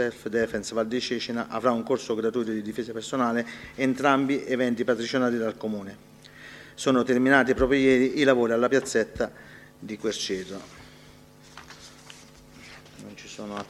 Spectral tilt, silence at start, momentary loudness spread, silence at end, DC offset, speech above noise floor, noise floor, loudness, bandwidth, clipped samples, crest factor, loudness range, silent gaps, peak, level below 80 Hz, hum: -4.5 dB/octave; 0 s; 24 LU; 0 s; under 0.1%; 26 dB; -51 dBFS; -25 LUFS; 14 kHz; under 0.1%; 24 dB; 13 LU; none; -4 dBFS; -52 dBFS; none